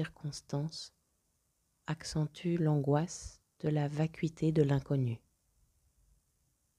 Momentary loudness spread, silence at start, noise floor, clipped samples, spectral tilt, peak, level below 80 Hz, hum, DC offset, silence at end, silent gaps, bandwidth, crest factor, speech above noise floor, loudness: 15 LU; 0 s; -78 dBFS; under 0.1%; -7 dB/octave; -16 dBFS; -62 dBFS; none; under 0.1%; 1.6 s; none; 11 kHz; 20 dB; 45 dB; -34 LUFS